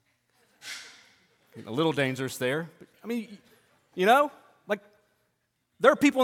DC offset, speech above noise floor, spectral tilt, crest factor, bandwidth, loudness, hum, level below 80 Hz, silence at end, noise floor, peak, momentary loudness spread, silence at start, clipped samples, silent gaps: under 0.1%; 50 dB; -5 dB/octave; 24 dB; 17 kHz; -27 LUFS; none; -74 dBFS; 0 s; -76 dBFS; -6 dBFS; 24 LU; 0.65 s; under 0.1%; none